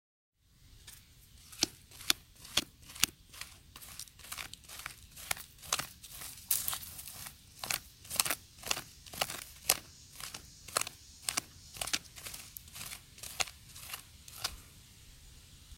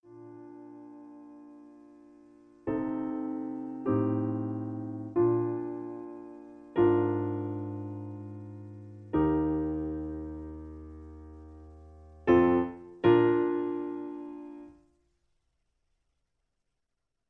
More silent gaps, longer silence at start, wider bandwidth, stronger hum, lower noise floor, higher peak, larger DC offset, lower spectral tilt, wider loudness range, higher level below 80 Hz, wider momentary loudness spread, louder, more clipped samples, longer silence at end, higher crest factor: neither; first, 0.6 s vs 0.05 s; first, 17 kHz vs 4 kHz; neither; second, -61 dBFS vs -85 dBFS; first, 0 dBFS vs -10 dBFS; neither; second, 0 dB/octave vs -10 dB/octave; second, 5 LU vs 10 LU; second, -62 dBFS vs -54 dBFS; second, 20 LU vs 24 LU; second, -37 LUFS vs -30 LUFS; neither; second, 0 s vs 2.6 s; first, 40 dB vs 20 dB